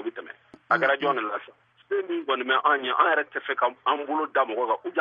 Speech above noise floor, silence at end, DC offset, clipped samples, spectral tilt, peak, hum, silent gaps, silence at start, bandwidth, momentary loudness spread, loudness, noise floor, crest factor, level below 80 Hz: 22 dB; 0 s; under 0.1%; under 0.1%; -6 dB/octave; -8 dBFS; none; none; 0 s; 7 kHz; 10 LU; -25 LUFS; -47 dBFS; 18 dB; -84 dBFS